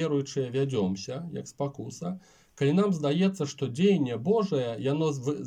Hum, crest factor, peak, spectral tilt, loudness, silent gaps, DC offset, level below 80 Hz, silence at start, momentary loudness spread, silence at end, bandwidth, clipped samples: none; 16 dB; -12 dBFS; -6.5 dB/octave; -28 LUFS; none; under 0.1%; -70 dBFS; 0 s; 12 LU; 0 s; 9.6 kHz; under 0.1%